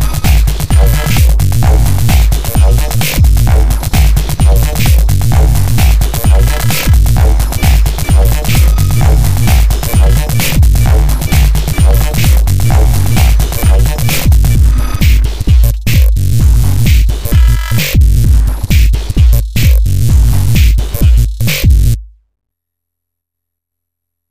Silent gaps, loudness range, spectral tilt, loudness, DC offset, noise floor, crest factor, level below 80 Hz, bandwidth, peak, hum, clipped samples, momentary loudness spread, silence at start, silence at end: none; 1 LU; -5 dB/octave; -10 LUFS; 7%; -78 dBFS; 8 dB; -10 dBFS; 16 kHz; 0 dBFS; none; under 0.1%; 2 LU; 0 s; 0 s